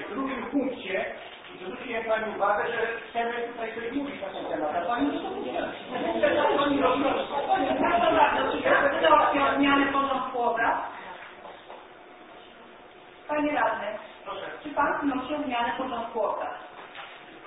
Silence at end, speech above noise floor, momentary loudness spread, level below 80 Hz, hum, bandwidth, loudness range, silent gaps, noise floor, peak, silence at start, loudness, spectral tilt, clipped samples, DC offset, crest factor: 0 s; 21 dB; 19 LU; -58 dBFS; none; 4 kHz; 10 LU; none; -49 dBFS; -6 dBFS; 0 s; -26 LUFS; -8.5 dB/octave; under 0.1%; under 0.1%; 22 dB